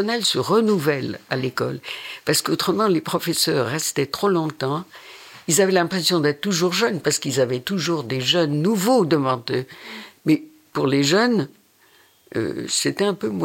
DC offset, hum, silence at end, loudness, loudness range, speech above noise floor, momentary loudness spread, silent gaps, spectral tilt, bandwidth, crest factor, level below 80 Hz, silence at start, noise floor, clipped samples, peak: under 0.1%; none; 0 s; -21 LUFS; 2 LU; 35 dB; 11 LU; none; -4 dB/octave; 17 kHz; 18 dB; -66 dBFS; 0 s; -55 dBFS; under 0.1%; -4 dBFS